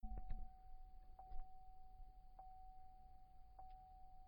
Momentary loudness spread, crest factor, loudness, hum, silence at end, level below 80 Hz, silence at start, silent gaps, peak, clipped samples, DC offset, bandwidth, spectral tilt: 9 LU; 20 dB; -63 LUFS; none; 0 s; -56 dBFS; 0 s; none; -34 dBFS; under 0.1%; under 0.1%; 4.7 kHz; -8 dB/octave